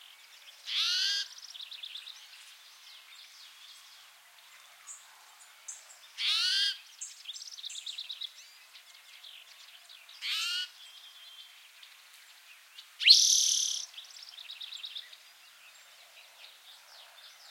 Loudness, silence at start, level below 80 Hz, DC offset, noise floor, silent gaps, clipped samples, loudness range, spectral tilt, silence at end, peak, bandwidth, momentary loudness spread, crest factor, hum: -28 LUFS; 0.45 s; under -90 dBFS; under 0.1%; -57 dBFS; none; under 0.1%; 22 LU; 8 dB/octave; 0 s; -6 dBFS; 16.5 kHz; 25 LU; 30 dB; none